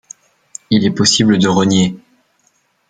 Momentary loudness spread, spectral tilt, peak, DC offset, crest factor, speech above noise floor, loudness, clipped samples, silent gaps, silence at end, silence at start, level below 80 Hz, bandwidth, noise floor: 14 LU; -4.5 dB/octave; 0 dBFS; under 0.1%; 14 dB; 47 dB; -13 LUFS; under 0.1%; none; 0.95 s; 0.7 s; -50 dBFS; 9.4 kHz; -60 dBFS